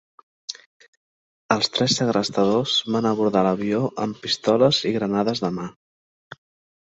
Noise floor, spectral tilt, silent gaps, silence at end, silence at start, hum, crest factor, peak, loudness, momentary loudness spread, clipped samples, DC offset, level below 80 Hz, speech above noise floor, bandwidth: under -90 dBFS; -4.5 dB/octave; 0.66-0.80 s, 0.88-1.49 s; 1.1 s; 0.5 s; none; 20 dB; -2 dBFS; -21 LUFS; 17 LU; under 0.1%; under 0.1%; -60 dBFS; over 69 dB; 8.2 kHz